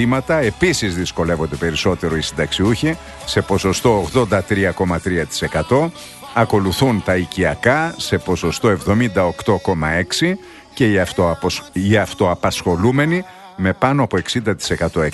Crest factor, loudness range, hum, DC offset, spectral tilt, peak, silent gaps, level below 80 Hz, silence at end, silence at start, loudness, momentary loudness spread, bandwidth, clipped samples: 16 dB; 1 LU; none; under 0.1%; -5.5 dB/octave; 0 dBFS; none; -38 dBFS; 0 s; 0 s; -18 LUFS; 5 LU; 12.5 kHz; under 0.1%